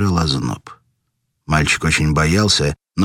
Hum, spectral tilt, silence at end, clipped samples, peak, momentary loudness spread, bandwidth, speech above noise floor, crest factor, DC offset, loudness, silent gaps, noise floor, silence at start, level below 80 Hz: none; -4.5 dB/octave; 0 s; under 0.1%; -2 dBFS; 8 LU; 16 kHz; 54 dB; 16 dB; under 0.1%; -16 LUFS; none; -71 dBFS; 0 s; -32 dBFS